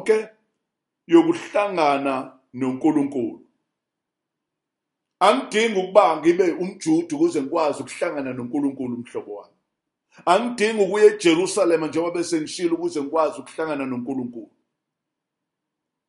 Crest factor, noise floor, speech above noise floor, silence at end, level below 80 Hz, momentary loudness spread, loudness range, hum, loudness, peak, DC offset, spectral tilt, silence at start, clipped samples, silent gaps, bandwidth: 22 dB; -83 dBFS; 62 dB; 1.65 s; -72 dBFS; 13 LU; 6 LU; none; -21 LUFS; 0 dBFS; under 0.1%; -4.5 dB/octave; 0 s; under 0.1%; none; 11.5 kHz